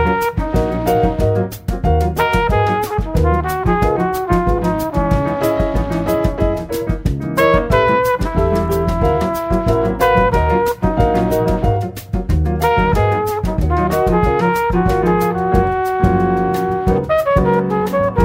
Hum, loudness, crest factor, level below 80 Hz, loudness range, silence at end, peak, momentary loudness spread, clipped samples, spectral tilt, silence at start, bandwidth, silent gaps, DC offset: none; -16 LUFS; 16 dB; -24 dBFS; 1 LU; 0 s; 0 dBFS; 5 LU; under 0.1%; -7.5 dB/octave; 0 s; 16.5 kHz; none; under 0.1%